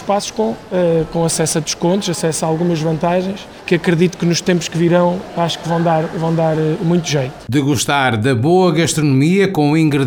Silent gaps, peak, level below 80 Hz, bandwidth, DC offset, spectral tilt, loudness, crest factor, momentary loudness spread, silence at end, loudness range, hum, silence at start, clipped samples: none; -2 dBFS; -46 dBFS; over 20 kHz; under 0.1%; -5.5 dB/octave; -15 LUFS; 14 dB; 6 LU; 0 s; 2 LU; none; 0 s; under 0.1%